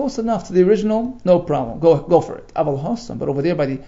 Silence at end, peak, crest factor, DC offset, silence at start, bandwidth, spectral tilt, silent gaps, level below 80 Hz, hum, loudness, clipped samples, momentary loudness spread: 0 s; -2 dBFS; 16 dB; under 0.1%; 0 s; 7.8 kHz; -7.5 dB/octave; none; -44 dBFS; none; -18 LUFS; under 0.1%; 8 LU